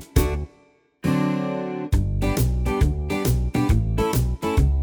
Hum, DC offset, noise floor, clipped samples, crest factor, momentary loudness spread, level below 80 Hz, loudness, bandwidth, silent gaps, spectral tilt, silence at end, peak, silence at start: none; under 0.1%; -57 dBFS; under 0.1%; 18 dB; 5 LU; -26 dBFS; -23 LUFS; over 20 kHz; none; -6.5 dB/octave; 0 s; -4 dBFS; 0 s